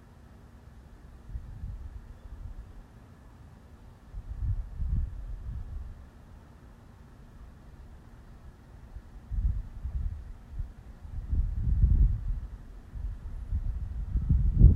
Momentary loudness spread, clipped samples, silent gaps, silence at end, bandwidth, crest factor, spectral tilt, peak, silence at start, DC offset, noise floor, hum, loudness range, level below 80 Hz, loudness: 24 LU; under 0.1%; none; 0 s; 2.5 kHz; 26 dB; -10 dB/octave; -6 dBFS; 0.2 s; under 0.1%; -52 dBFS; none; 15 LU; -32 dBFS; -34 LUFS